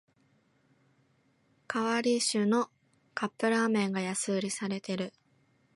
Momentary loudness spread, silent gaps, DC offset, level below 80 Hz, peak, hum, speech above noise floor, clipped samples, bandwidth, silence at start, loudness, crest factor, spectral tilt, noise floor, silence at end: 9 LU; none; under 0.1%; -80 dBFS; -16 dBFS; none; 40 dB; under 0.1%; 11.5 kHz; 1.7 s; -31 LUFS; 16 dB; -4 dB/octave; -70 dBFS; 0.65 s